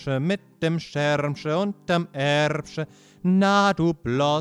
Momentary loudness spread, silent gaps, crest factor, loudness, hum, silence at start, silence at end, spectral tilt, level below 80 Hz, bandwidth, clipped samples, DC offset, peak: 10 LU; none; 14 dB; -23 LUFS; none; 0 s; 0 s; -6 dB/octave; -56 dBFS; 11 kHz; under 0.1%; under 0.1%; -8 dBFS